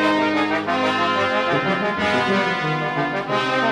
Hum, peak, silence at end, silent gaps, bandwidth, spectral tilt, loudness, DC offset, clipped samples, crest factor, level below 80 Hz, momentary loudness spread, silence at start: none; -6 dBFS; 0 s; none; 12 kHz; -5 dB/octave; -20 LUFS; under 0.1%; under 0.1%; 14 dB; -56 dBFS; 3 LU; 0 s